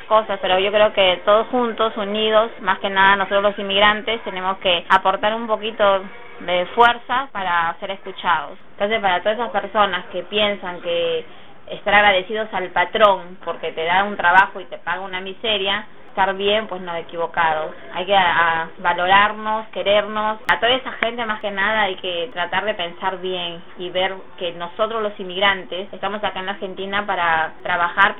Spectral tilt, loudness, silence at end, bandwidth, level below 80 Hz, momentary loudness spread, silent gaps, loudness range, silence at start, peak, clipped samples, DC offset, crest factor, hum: -5.5 dB/octave; -19 LUFS; 0 s; 6.8 kHz; -52 dBFS; 12 LU; none; 5 LU; 0 s; 0 dBFS; under 0.1%; 2%; 20 dB; none